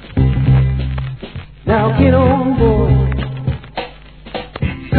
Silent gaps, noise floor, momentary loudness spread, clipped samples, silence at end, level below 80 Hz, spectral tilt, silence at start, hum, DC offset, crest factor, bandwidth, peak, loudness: none; -35 dBFS; 16 LU; under 0.1%; 0 s; -24 dBFS; -12 dB/octave; 0 s; none; 0.4%; 14 dB; 4.5 kHz; 0 dBFS; -15 LUFS